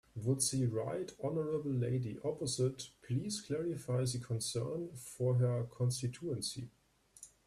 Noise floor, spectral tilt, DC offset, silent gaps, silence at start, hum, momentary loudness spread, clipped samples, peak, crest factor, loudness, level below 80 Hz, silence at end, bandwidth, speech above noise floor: -60 dBFS; -5.5 dB/octave; under 0.1%; none; 0.15 s; none; 9 LU; under 0.1%; -20 dBFS; 16 dB; -37 LUFS; -68 dBFS; 0.2 s; 13 kHz; 23 dB